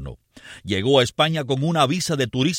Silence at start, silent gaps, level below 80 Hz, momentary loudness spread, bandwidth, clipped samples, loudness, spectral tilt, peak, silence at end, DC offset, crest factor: 0 s; none; -50 dBFS; 10 LU; 16.5 kHz; under 0.1%; -20 LUFS; -5 dB/octave; -4 dBFS; 0 s; under 0.1%; 18 dB